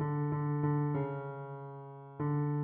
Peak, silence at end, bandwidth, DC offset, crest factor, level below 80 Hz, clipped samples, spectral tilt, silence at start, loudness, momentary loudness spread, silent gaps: -20 dBFS; 0 s; 3.2 kHz; under 0.1%; 14 dB; -68 dBFS; under 0.1%; -10.5 dB/octave; 0 s; -35 LUFS; 14 LU; none